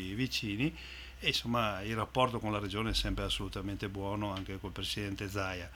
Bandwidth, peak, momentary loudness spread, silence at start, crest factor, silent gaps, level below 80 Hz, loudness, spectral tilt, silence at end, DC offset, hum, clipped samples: 19.5 kHz; -14 dBFS; 7 LU; 0 s; 22 dB; none; -48 dBFS; -35 LUFS; -4.5 dB/octave; 0 s; under 0.1%; none; under 0.1%